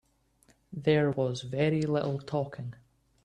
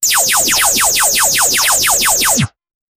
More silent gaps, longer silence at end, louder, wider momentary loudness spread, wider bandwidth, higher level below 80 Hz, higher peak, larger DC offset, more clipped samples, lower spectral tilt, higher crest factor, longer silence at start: neither; about the same, 0.5 s vs 0.5 s; second, -30 LUFS vs -10 LUFS; first, 15 LU vs 2 LU; second, 9.6 kHz vs 17.5 kHz; second, -64 dBFS vs -42 dBFS; second, -12 dBFS vs 0 dBFS; neither; neither; first, -7 dB/octave vs -0.5 dB/octave; first, 18 dB vs 12 dB; first, 0.7 s vs 0 s